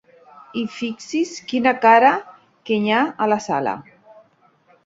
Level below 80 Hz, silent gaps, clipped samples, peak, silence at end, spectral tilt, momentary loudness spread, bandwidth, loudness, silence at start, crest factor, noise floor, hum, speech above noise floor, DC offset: -66 dBFS; none; under 0.1%; -2 dBFS; 1.05 s; -4.5 dB/octave; 15 LU; 7.8 kHz; -19 LUFS; 0.55 s; 18 dB; -57 dBFS; none; 39 dB; under 0.1%